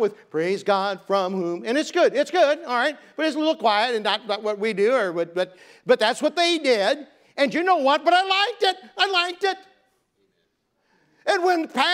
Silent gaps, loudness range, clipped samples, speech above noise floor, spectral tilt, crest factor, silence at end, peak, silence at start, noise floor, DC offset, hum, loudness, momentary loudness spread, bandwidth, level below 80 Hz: none; 3 LU; under 0.1%; 49 dB; -3.5 dB/octave; 18 dB; 0 s; -4 dBFS; 0 s; -71 dBFS; under 0.1%; none; -22 LUFS; 8 LU; 15.5 kHz; -82 dBFS